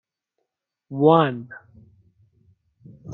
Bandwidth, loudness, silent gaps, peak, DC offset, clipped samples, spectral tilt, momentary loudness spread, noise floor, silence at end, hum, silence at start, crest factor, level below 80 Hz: 4.2 kHz; -18 LUFS; none; -4 dBFS; under 0.1%; under 0.1%; -10 dB/octave; 25 LU; -80 dBFS; 0 s; none; 0.9 s; 22 dB; -68 dBFS